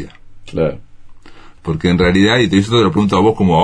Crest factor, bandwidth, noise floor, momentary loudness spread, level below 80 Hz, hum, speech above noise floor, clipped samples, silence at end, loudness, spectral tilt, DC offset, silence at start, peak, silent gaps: 14 dB; 10 kHz; -36 dBFS; 14 LU; -36 dBFS; none; 23 dB; under 0.1%; 0 s; -13 LUFS; -6.5 dB/octave; under 0.1%; 0 s; 0 dBFS; none